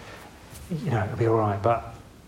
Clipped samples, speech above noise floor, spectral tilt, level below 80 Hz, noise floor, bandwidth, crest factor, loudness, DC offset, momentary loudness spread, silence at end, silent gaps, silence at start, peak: under 0.1%; 20 dB; -8 dB/octave; -52 dBFS; -44 dBFS; 15.5 kHz; 18 dB; -26 LUFS; under 0.1%; 21 LU; 0.2 s; none; 0 s; -10 dBFS